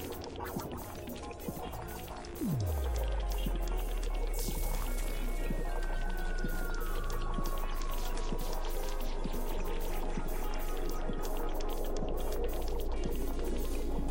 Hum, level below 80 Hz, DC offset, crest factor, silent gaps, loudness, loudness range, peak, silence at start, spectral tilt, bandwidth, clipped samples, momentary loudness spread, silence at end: none; -34 dBFS; under 0.1%; 10 dB; none; -39 LUFS; 2 LU; -22 dBFS; 0 s; -5 dB/octave; 17 kHz; under 0.1%; 5 LU; 0 s